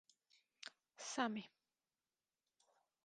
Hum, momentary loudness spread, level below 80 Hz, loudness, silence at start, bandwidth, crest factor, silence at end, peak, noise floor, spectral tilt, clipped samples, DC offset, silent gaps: none; 15 LU; under -90 dBFS; -45 LUFS; 0.6 s; 10 kHz; 26 dB; 1.6 s; -26 dBFS; under -90 dBFS; -3 dB/octave; under 0.1%; under 0.1%; none